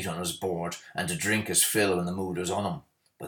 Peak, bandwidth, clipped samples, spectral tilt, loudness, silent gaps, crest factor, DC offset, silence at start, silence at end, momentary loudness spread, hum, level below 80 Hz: -10 dBFS; over 20 kHz; under 0.1%; -3 dB/octave; -28 LUFS; none; 18 dB; under 0.1%; 0 s; 0 s; 11 LU; none; -62 dBFS